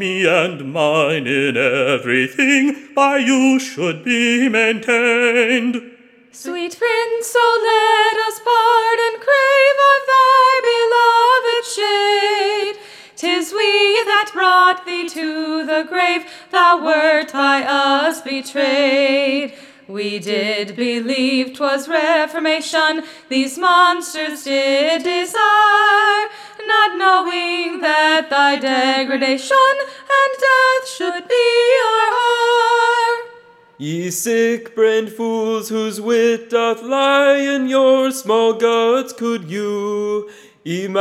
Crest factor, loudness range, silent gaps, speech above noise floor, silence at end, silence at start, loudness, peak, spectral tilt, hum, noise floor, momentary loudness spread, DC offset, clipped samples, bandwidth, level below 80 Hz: 16 dB; 5 LU; none; 29 dB; 0 s; 0 s; -15 LUFS; 0 dBFS; -3 dB/octave; none; -44 dBFS; 10 LU; under 0.1%; under 0.1%; 16 kHz; -78 dBFS